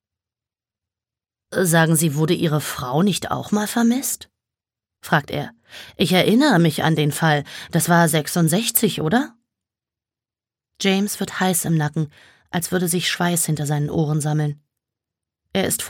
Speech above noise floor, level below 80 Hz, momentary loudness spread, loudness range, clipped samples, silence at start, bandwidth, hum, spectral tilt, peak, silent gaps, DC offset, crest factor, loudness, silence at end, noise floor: over 71 dB; -58 dBFS; 12 LU; 5 LU; under 0.1%; 1.5 s; 17.5 kHz; none; -4.5 dB/octave; -2 dBFS; none; under 0.1%; 20 dB; -20 LUFS; 0 s; under -90 dBFS